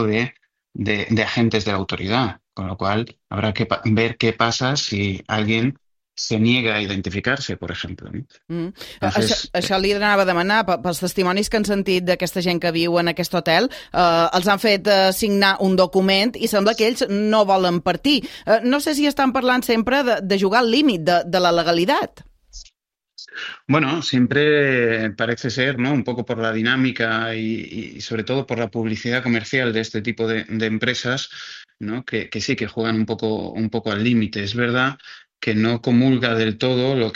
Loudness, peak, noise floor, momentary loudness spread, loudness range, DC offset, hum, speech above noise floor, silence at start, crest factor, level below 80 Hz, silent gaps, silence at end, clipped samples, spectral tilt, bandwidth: -19 LUFS; -2 dBFS; -69 dBFS; 11 LU; 6 LU; under 0.1%; none; 49 dB; 0 s; 18 dB; -50 dBFS; none; 0 s; under 0.1%; -5 dB/octave; 16 kHz